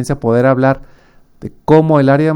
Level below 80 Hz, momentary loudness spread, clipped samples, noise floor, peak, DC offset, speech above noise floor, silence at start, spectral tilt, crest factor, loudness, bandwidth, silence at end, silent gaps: -40 dBFS; 18 LU; under 0.1%; -45 dBFS; 0 dBFS; under 0.1%; 33 dB; 0 s; -8 dB/octave; 12 dB; -12 LUFS; 12 kHz; 0 s; none